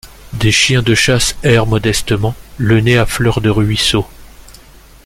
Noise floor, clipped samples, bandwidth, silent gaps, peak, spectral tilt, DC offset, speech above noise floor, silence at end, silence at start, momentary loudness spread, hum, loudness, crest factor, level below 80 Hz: -40 dBFS; under 0.1%; 16 kHz; none; 0 dBFS; -4.5 dB/octave; under 0.1%; 28 dB; 0.55 s; 0.05 s; 8 LU; none; -13 LUFS; 14 dB; -30 dBFS